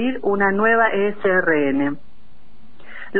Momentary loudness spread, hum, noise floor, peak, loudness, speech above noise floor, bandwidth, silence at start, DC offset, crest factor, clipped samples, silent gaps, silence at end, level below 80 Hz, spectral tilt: 9 LU; none; -52 dBFS; -6 dBFS; -18 LUFS; 34 dB; 4.5 kHz; 0 s; 4%; 16 dB; under 0.1%; none; 0 s; -54 dBFS; -10 dB/octave